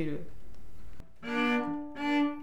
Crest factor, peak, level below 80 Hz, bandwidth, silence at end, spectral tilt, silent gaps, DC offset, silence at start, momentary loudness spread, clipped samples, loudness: 16 dB; -16 dBFS; -56 dBFS; 11.5 kHz; 0 s; -6 dB/octave; none; under 0.1%; 0 s; 15 LU; under 0.1%; -32 LUFS